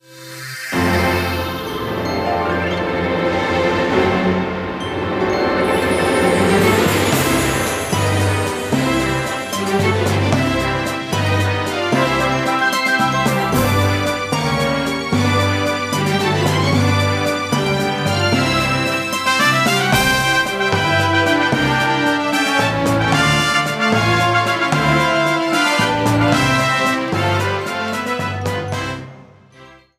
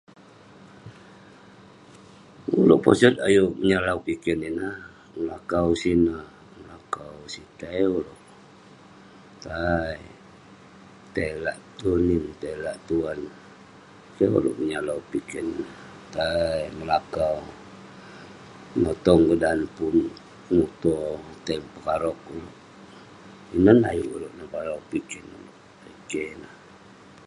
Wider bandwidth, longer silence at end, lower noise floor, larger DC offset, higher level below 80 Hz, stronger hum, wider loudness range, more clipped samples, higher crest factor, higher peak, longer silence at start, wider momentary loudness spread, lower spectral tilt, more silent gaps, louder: first, 15.5 kHz vs 11.5 kHz; second, 0.25 s vs 0.75 s; second, -44 dBFS vs -50 dBFS; neither; first, -40 dBFS vs -48 dBFS; neither; second, 3 LU vs 9 LU; neither; second, 16 dB vs 24 dB; about the same, 0 dBFS vs -2 dBFS; second, 0.1 s vs 0.85 s; second, 7 LU vs 25 LU; second, -4.5 dB/octave vs -6.5 dB/octave; neither; first, -16 LUFS vs -24 LUFS